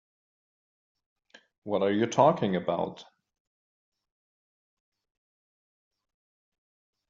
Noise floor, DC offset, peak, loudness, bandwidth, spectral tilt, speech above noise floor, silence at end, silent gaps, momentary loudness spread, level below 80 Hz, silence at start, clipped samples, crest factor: under -90 dBFS; under 0.1%; -8 dBFS; -27 LUFS; 7.4 kHz; -5.5 dB/octave; over 64 dB; 4.05 s; none; 12 LU; -74 dBFS; 1.65 s; under 0.1%; 26 dB